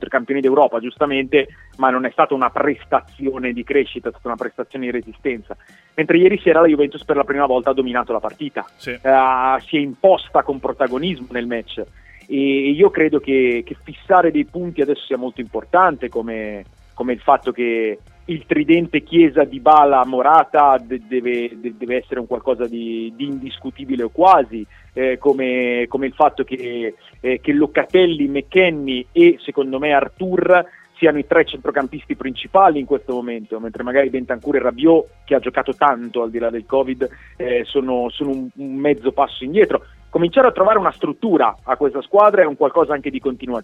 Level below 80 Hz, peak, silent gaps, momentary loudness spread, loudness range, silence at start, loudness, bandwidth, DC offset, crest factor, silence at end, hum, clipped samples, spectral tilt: -48 dBFS; 0 dBFS; none; 13 LU; 5 LU; 0 s; -17 LUFS; 5.8 kHz; under 0.1%; 18 dB; 0 s; none; under 0.1%; -7.5 dB/octave